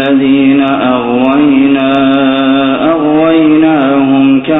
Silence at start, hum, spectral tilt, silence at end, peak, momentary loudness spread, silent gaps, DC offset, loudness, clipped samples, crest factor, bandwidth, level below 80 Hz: 0 s; none; -9 dB/octave; 0 s; 0 dBFS; 3 LU; none; under 0.1%; -8 LUFS; under 0.1%; 8 dB; 4 kHz; -44 dBFS